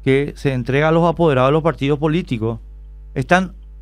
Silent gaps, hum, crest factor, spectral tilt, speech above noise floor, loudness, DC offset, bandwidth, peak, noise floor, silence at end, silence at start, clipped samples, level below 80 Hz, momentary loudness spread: none; none; 16 dB; -7.5 dB/octave; 19 dB; -17 LUFS; under 0.1%; 10.5 kHz; 0 dBFS; -36 dBFS; 0 s; 0 s; under 0.1%; -36 dBFS; 12 LU